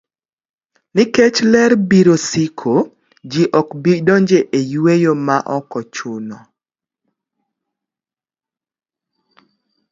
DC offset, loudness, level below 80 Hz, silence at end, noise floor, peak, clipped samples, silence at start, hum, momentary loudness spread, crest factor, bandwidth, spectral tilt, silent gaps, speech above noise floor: under 0.1%; -14 LUFS; -58 dBFS; 3.55 s; under -90 dBFS; 0 dBFS; under 0.1%; 0.95 s; none; 14 LU; 16 dB; 7.8 kHz; -5.5 dB/octave; none; over 76 dB